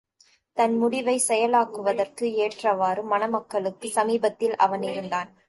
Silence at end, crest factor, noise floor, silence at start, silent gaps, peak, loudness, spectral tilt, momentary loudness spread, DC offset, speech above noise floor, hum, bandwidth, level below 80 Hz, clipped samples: 0.25 s; 18 dB; -62 dBFS; 0.55 s; none; -6 dBFS; -24 LUFS; -3.5 dB/octave; 7 LU; under 0.1%; 38 dB; none; 12 kHz; -74 dBFS; under 0.1%